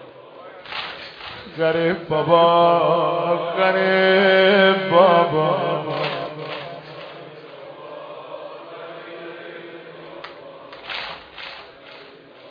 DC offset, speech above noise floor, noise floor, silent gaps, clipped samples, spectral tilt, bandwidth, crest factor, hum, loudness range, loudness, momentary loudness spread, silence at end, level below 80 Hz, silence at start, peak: under 0.1%; 27 dB; -43 dBFS; none; under 0.1%; -7.5 dB/octave; 5.2 kHz; 20 dB; none; 20 LU; -18 LUFS; 24 LU; 0 s; -64 dBFS; 0 s; 0 dBFS